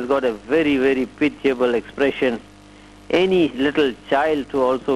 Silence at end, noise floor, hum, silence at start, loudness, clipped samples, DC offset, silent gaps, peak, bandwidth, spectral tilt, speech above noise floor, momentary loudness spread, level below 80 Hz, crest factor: 0 s; -44 dBFS; 50 Hz at -50 dBFS; 0 s; -20 LUFS; under 0.1%; under 0.1%; none; -6 dBFS; 12.5 kHz; -6 dB/octave; 25 dB; 4 LU; -50 dBFS; 14 dB